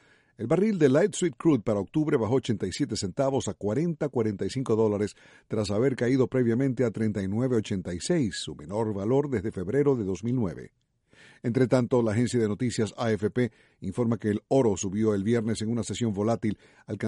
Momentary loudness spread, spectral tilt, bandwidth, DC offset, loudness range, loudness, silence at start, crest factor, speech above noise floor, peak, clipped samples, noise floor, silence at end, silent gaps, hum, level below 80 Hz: 7 LU; -6.5 dB/octave; 11.5 kHz; under 0.1%; 2 LU; -27 LUFS; 0.4 s; 18 dB; 31 dB; -8 dBFS; under 0.1%; -57 dBFS; 0 s; none; none; -58 dBFS